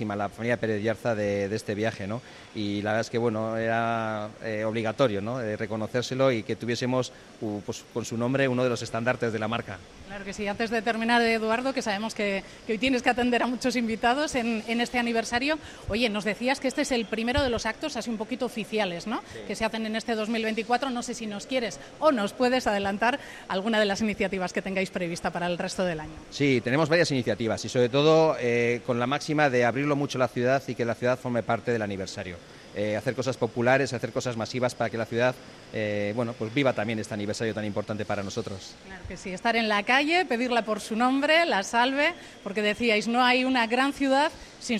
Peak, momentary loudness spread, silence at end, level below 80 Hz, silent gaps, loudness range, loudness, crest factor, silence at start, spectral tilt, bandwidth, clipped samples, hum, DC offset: -8 dBFS; 11 LU; 0 s; -54 dBFS; none; 5 LU; -27 LUFS; 18 dB; 0 s; -5 dB/octave; 14 kHz; under 0.1%; none; under 0.1%